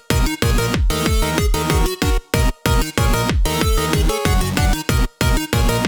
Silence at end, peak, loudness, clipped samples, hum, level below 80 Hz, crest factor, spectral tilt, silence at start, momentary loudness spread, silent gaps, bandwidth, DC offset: 0 s; -2 dBFS; -18 LUFS; under 0.1%; none; -20 dBFS; 14 dB; -4.5 dB/octave; 0.1 s; 2 LU; none; over 20 kHz; under 0.1%